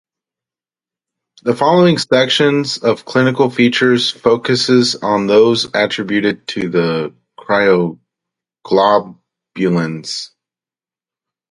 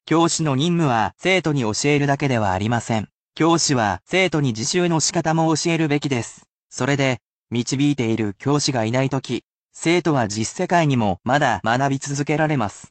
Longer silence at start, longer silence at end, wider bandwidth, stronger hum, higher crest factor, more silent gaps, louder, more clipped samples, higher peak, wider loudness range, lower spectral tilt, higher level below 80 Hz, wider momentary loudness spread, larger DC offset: first, 1.45 s vs 0.05 s; first, 1.25 s vs 0.05 s; first, 11.5 kHz vs 9 kHz; neither; about the same, 16 dB vs 14 dB; second, none vs 3.14-3.28 s, 6.49-6.70 s, 7.22-7.46 s, 9.45-9.69 s; first, -14 LUFS vs -20 LUFS; neither; first, 0 dBFS vs -6 dBFS; first, 5 LU vs 2 LU; about the same, -5 dB/octave vs -4.5 dB/octave; about the same, -58 dBFS vs -54 dBFS; first, 10 LU vs 7 LU; neither